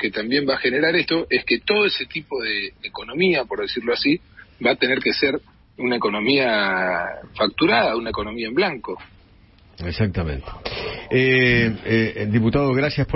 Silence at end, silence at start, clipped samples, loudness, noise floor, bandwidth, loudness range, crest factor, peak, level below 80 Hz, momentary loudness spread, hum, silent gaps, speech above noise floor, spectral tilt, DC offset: 0 s; 0 s; under 0.1%; -20 LUFS; -51 dBFS; 5.8 kHz; 3 LU; 18 dB; -4 dBFS; -42 dBFS; 12 LU; none; none; 30 dB; -9.5 dB/octave; under 0.1%